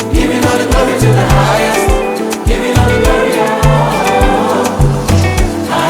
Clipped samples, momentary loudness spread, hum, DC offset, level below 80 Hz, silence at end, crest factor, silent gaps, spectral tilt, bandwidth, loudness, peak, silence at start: under 0.1%; 5 LU; none; under 0.1%; -18 dBFS; 0 s; 10 dB; none; -5.5 dB/octave; 19.5 kHz; -11 LUFS; 0 dBFS; 0 s